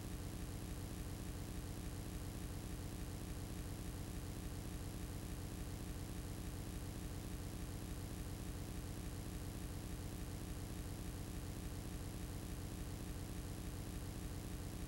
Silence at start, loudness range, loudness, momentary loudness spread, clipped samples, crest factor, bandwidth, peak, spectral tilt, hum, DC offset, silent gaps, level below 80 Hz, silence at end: 0 s; 0 LU; -48 LUFS; 0 LU; under 0.1%; 12 dB; 16 kHz; -36 dBFS; -5 dB/octave; none; under 0.1%; none; -52 dBFS; 0 s